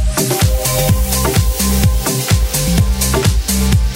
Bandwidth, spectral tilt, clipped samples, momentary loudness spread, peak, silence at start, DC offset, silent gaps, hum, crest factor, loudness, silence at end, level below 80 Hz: 16.5 kHz; -4.5 dB/octave; under 0.1%; 1 LU; -2 dBFS; 0 s; under 0.1%; none; none; 12 dB; -14 LUFS; 0 s; -18 dBFS